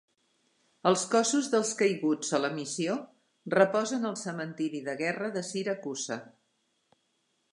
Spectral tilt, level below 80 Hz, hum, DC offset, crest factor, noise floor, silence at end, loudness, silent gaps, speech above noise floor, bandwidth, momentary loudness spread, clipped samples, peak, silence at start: -4 dB/octave; -84 dBFS; none; under 0.1%; 24 dB; -75 dBFS; 1.25 s; -30 LUFS; none; 46 dB; 11.5 kHz; 10 LU; under 0.1%; -8 dBFS; 0.85 s